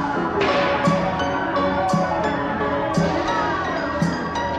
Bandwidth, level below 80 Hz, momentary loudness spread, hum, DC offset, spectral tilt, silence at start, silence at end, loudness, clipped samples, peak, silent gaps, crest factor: 10.5 kHz; -42 dBFS; 4 LU; none; under 0.1%; -6 dB/octave; 0 s; 0 s; -21 LUFS; under 0.1%; -8 dBFS; none; 14 dB